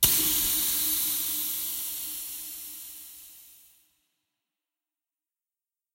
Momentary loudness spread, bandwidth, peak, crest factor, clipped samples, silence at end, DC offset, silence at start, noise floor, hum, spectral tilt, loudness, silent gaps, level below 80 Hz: 20 LU; 16 kHz; -4 dBFS; 28 dB; under 0.1%; 2.4 s; under 0.1%; 0 s; under -90 dBFS; none; 0 dB/octave; -26 LUFS; none; -56 dBFS